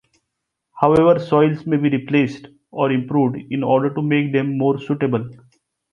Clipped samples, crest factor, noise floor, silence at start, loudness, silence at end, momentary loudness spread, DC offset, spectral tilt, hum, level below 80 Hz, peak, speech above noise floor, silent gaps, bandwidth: under 0.1%; 18 dB; -78 dBFS; 0.75 s; -18 LUFS; 0.6 s; 9 LU; under 0.1%; -9 dB/octave; none; -54 dBFS; 0 dBFS; 60 dB; none; 7 kHz